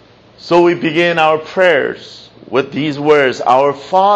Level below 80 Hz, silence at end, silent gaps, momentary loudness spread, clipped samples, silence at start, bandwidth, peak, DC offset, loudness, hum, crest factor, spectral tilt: -58 dBFS; 0 s; none; 7 LU; under 0.1%; 0.45 s; 8.2 kHz; 0 dBFS; under 0.1%; -13 LUFS; none; 12 dB; -5.5 dB/octave